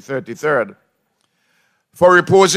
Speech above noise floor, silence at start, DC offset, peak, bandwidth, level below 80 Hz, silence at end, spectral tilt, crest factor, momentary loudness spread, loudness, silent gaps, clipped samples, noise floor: 52 dB; 0.1 s; under 0.1%; 0 dBFS; 14.5 kHz; -58 dBFS; 0 s; -4 dB/octave; 16 dB; 15 LU; -15 LUFS; none; under 0.1%; -66 dBFS